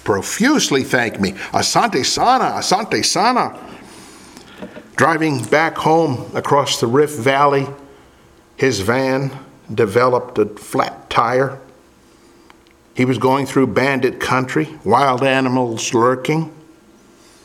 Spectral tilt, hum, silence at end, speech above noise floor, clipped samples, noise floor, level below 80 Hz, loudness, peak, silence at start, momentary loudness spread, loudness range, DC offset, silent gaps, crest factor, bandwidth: -4 dB/octave; none; 0.85 s; 32 dB; under 0.1%; -48 dBFS; -54 dBFS; -16 LUFS; 0 dBFS; 0.05 s; 10 LU; 3 LU; under 0.1%; none; 18 dB; 16.5 kHz